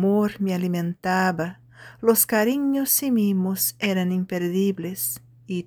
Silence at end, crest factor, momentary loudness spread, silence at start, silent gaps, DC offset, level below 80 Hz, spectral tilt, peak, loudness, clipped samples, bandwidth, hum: 0.05 s; 18 dB; 8 LU; 0 s; none; under 0.1%; -62 dBFS; -5 dB/octave; -6 dBFS; -23 LUFS; under 0.1%; over 20 kHz; none